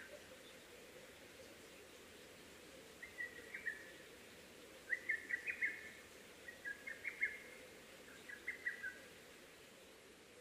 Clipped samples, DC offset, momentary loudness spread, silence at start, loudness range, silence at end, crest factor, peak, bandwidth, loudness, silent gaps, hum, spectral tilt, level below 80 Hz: under 0.1%; under 0.1%; 17 LU; 0 s; 8 LU; 0 s; 24 dB; -28 dBFS; 15.5 kHz; -48 LUFS; none; none; -2 dB/octave; -80 dBFS